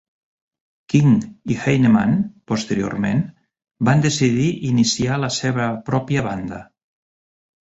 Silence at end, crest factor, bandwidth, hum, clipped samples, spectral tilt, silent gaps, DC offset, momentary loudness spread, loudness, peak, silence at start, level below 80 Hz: 1.15 s; 16 dB; 8 kHz; none; under 0.1%; -5.5 dB/octave; none; under 0.1%; 10 LU; -19 LUFS; -4 dBFS; 0.9 s; -50 dBFS